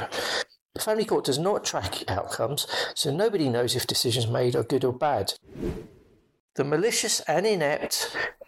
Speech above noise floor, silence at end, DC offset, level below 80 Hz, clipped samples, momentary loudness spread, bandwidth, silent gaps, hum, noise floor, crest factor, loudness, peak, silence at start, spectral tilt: 31 dB; 0.15 s; under 0.1%; -54 dBFS; under 0.1%; 8 LU; 16.5 kHz; 0.61-0.69 s, 6.40-6.49 s; none; -57 dBFS; 14 dB; -26 LUFS; -14 dBFS; 0 s; -3.5 dB/octave